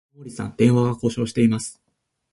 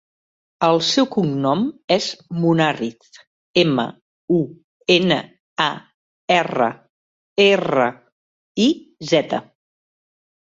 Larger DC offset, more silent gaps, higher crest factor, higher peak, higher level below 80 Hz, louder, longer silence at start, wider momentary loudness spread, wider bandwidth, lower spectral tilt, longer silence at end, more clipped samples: neither; second, none vs 1.84-1.88 s, 3.27-3.54 s, 4.02-4.28 s, 4.64-4.80 s, 5.40-5.56 s, 5.94-6.28 s, 6.90-7.36 s, 8.12-8.55 s; about the same, 18 dB vs 18 dB; about the same, -4 dBFS vs -2 dBFS; first, -52 dBFS vs -62 dBFS; about the same, -21 LUFS vs -19 LUFS; second, 0.2 s vs 0.6 s; first, 15 LU vs 12 LU; first, 11.5 kHz vs 7.8 kHz; first, -7 dB/octave vs -5 dB/octave; second, 0.6 s vs 1 s; neither